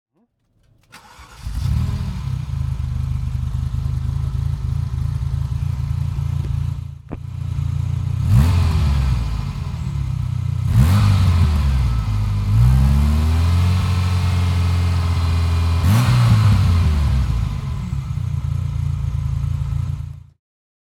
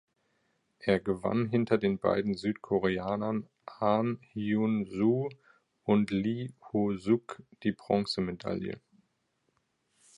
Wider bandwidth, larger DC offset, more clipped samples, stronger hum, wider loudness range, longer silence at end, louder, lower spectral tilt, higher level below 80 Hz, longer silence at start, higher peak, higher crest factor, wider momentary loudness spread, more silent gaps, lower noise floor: first, 14.5 kHz vs 10.5 kHz; neither; neither; neither; first, 7 LU vs 3 LU; second, 0.7 s vs 1.4 s; first, -19 LUFS vs -31 LUFS; about the same, -7 dB/octave vs -7.5 dB/octave; first, -24 dBFS vs -62 dBFS; first, 0.95 s vs 0.8 s; first, -2 dBFS vs -12 dBFS; about the same, 16 dB vs 20 dB; about the same, 10 LU vs 9 LU; neither; second, -64 dBFS vs -77 dBFS